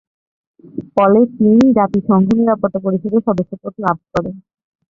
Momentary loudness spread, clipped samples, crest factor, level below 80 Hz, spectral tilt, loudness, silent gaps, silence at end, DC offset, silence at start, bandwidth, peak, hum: 12 LU; under 0.1%; 14 dB; -50 dBFS; -9 dB/octave; -15 LUFS; none; 0.55 s; under 0.1%; 0.75 s; 7.2 kHz; -2 dBFS; none